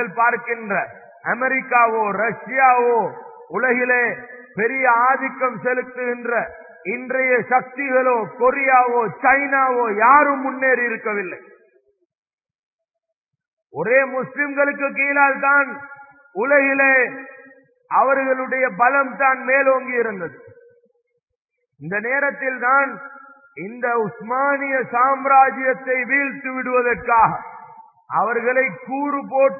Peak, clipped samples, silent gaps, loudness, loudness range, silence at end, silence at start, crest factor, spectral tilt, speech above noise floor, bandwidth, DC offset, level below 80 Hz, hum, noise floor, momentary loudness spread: 0 dBFS; under 0.1%; 12.05-12.10 s, 12.18-12.23 s, 12.33-12.38 s, 12.55-12.79 s, 13.16-13.24 s, 13.48-13.57 s, 21.40-21.45 s; -18 LUFS; 6 LU; 0 s; 0 s; 18 dB; -13.5 dB/octave; 62 dB; 2.7 kHz; under 0.1%; -62 dBFS; none; -81 dBFS; 13 LU